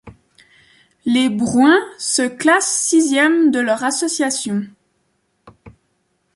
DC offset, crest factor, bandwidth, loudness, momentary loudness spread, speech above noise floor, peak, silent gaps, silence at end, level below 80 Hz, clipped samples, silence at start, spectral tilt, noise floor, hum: under 0.1%; 16 dB; 11.5 kHz; -16 LUFS; 8 LU; 51 dB; -2 dBFS; none; 0.65 s; -58 dBFS; under 0.1%; 0.05 s; -3 dB/octave; -66 dBFS; none